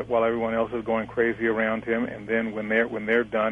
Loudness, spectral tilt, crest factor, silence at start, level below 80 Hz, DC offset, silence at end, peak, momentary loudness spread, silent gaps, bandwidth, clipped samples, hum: -25 LUFS; -7.5 dB/octave; 16 dB; 0 s; -56 dBFS; under 0.1%; 0 s; -8 dBFS; 4 LU; none; 6 kHz; under 0.1%; none